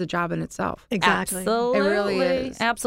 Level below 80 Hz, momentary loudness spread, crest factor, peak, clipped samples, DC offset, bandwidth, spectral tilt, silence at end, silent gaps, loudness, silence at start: -50 dBFS; 7 LU; 20 dB; -4 dBFS; under 0.1%; under 0.1%; 16 kHz; -4 dB/octave; 0 s; none; -23 LUFS; 0 s